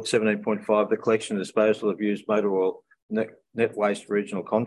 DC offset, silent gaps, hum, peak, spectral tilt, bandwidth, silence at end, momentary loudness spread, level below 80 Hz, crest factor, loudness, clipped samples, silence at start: under 0.1%; 3.02-3.09 s; none; -8 dBFS; -5.5 dB/octave; 11.5 kHz; 0 s; 7 LU; -72 dBFS; 16 dB; -25 LUFS; under 0.1%; 0 s